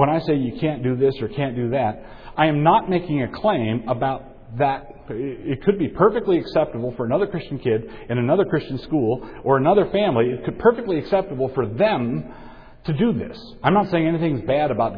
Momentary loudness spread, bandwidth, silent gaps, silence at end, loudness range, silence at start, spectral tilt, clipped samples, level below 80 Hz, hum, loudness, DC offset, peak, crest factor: 10 LU; 5.2 kHz; none; 0 s; 2 LU; 0 s; -10 dB/octave; under 0.1%; -44 dBFS; none; -21 LUFS; under 0.1%; -2 dBFS; 18 dB